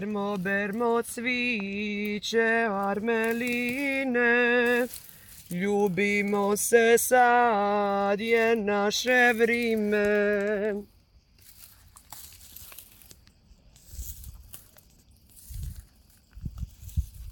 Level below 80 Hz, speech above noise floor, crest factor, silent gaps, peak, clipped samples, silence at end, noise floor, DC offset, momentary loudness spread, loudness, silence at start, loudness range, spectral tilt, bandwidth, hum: -48 dBFS; 34 dB; 20 dB; none; -8 dBFS; under 0.1%; 0 s; -59 dBFS; under 0.1%; 23 LU; -25 LUFS; 0 s; 22 LU; -4 dB/octave; 17 kHz; none